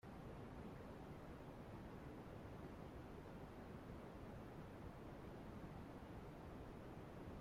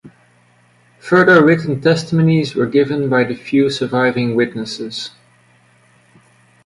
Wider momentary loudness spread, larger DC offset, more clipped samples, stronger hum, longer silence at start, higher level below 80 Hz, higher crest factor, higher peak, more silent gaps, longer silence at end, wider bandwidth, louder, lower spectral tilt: second, 1 LU vs 14 LU; neither; neither; neither; about the same, 0.05 s vs 0.05 s; second, -64 dBFS vs -56 dBFS; about the same, 14 dB vs 16 dB; second, -42 dBFS vs 0 dBFS; neither; second, 0 s vs 1.55 s; first, 16 kHz vs 11.5 kHz; second, -56 LUFS vs -15 LUFS; about the same, -7.5 dB/octave vs -6.5 dB/octave